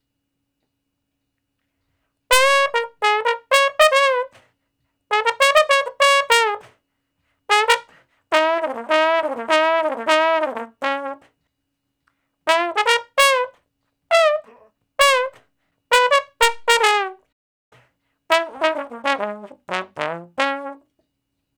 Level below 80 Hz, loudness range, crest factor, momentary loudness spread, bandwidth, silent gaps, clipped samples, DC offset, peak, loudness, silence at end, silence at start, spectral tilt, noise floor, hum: -56 dBFS; 5 LU; 20 dB; 13 LU; over 20 kHz; 17.32-17.72 s; under 0.1%; under 0.1%; 0 dBFS; -18 LUFS; 0.85 s; 2.3 s; -0.5 dB/octave; -76 dBFS; none